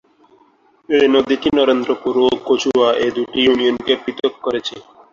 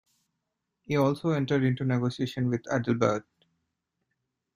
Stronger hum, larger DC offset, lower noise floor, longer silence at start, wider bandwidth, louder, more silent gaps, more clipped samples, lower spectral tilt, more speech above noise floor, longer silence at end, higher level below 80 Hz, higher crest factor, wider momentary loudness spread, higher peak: neither; neither; second, -54 dBFS vs -83 dBFS; about the same, 0.9 s vs 0.9 s; second, 7.4 kHz vs 15 kHz; first, -16 LUFS vs -28 LUFS; neither; neither; second, -4 dB/octave vs -7 dB/octave; second, 38 dB vs 56 dB; second, 0.3 s vs 1.35 s; first, -54 dBFS vs -64 dBFS; about the same, 16 dB vs 20 dB; about the same, 7 LU vs 5 LU; first, -2 dBFS vs -10 dBFS